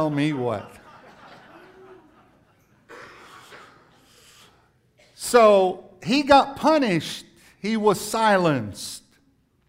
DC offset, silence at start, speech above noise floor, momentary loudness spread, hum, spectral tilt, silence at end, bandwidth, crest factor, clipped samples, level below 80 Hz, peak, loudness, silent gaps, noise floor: under 0.1%; 0 s; 43 dB; 20 LU; none; -5 dB/octave; 0.7 s; 16 kHz; 20 dB; under 0.1%; -58 dBFS; -4 dBFS; -21 LUFS; none; -63 dBFS